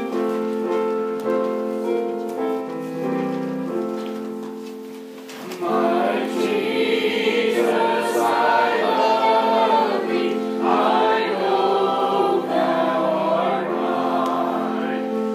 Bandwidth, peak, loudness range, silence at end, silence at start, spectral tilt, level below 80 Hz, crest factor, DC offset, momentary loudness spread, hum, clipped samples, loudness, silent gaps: 15.5 kHz; -6 dBFS; 7 LU; 0 s; 0 s; -5 dB/octave; -78 dBFS; 16 dB; under 0.1%; 11 LU; none; under 0.1%; -21 LUFS; none